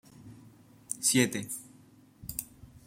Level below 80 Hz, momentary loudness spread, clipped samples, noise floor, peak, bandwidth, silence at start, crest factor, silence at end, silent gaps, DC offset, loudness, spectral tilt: -62 dBFS; 27 LU; under 0.1%; -58 dBFS; -12 dBFS; 16.5 kHz; 0.2 s; 24 dB; 0.1 s; none; under 0.1%; -30 LUFS; -3 dB/octave